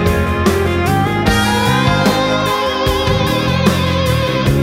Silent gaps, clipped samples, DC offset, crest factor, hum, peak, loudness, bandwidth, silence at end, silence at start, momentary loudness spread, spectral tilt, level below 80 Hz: none; under 0.1%; under 0.1%; 14 dB; none; 0 dBFS; -14 LUFS; 16.5 kHz; 0 s; 0 s; 2 LU; -5.5 dB/octave; -26 dBFS